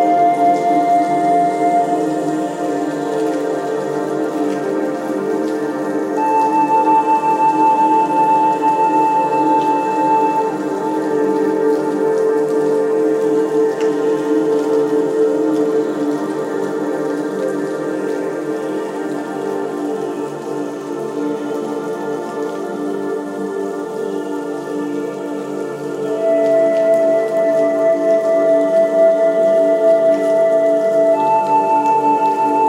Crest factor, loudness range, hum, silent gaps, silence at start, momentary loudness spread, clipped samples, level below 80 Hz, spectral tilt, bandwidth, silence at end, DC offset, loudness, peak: 12 dB; 9 LU; none; none; 0 s; 9 LU; under 0.1%; -68 dBFS; -6 dB/octave; 15.5 kHz; 0 s; under 0.1%; -16 LUFS; -4 dBFS